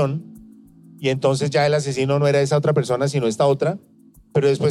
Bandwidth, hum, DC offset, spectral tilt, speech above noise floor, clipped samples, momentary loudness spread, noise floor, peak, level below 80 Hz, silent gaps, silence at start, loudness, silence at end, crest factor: 12 kHz; none; under 0.1%; -6 dB/octave; 27 dB; under 0.1%; 7 LU; -46 dBFS; -6 dBFS; -60 dBFS; none; 0 s; -20 LUFS; 0 s; 14 dB